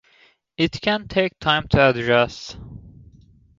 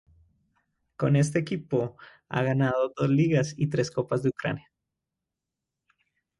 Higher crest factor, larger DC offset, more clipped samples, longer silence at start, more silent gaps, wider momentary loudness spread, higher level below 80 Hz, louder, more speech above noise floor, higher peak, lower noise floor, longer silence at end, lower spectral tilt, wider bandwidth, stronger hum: about the same, 20 dB vs 18 dB; neither; neither; second, 0.6 s vs 1 s; neither; first, 21 LU vs 9 LU; first, -44 dBFS vs -62 dBFS; first, -20 LUFS vs -27 LUFS; second, 37 dB vs 61 dB; first, -2 dBFS vs -10 dBFS; second, -57 dBFS vs -87 dBFS; second, 0.7 s vs 1.8 s; about the same, -6 dB/octave vs -7 dB/octave; second, 7.6 kHz vs 11.5 kHz; neither